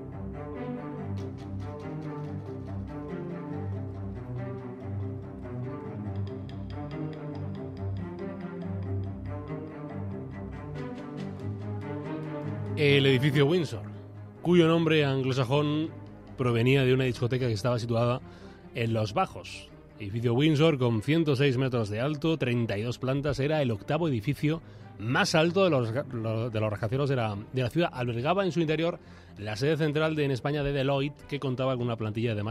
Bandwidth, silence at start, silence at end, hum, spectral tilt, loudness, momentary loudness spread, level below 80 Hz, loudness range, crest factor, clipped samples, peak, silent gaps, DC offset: 13.5 kHz; 0 s; 0 s; none; -7 dB/octave; -29 LUFS; 15 LU; -54 dBFS; 11 LU; 20 dB; under 0.1%; -10 dBFS; none; under 0.1%